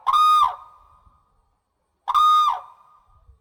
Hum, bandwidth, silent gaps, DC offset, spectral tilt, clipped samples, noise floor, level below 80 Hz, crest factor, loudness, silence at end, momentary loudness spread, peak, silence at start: none; over 20 kHz; none; under 0.1%; 1 dB/octave; under 0.1%; -72 dBFS; -60 dBFS; 14 dB; -18 LUFS; 0.75 s; 18 LU; -8 dBFS; 0.05 s